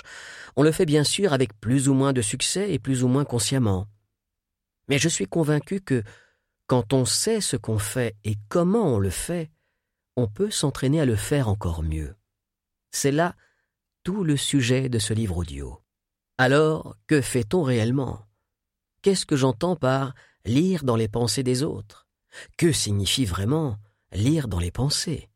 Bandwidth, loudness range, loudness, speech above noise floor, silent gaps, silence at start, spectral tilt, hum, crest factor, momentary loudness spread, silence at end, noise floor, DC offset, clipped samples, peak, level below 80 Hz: 16.5 kHz; 3 LU; -24 LUFS; 61 dB; none; 0.05 s; -5 dB/octave; none; 20 dB; 11 LU; 0.15 s; -84 dBFS; under 0.1%; under 0.1%; -6 dBFS; -46 dBFS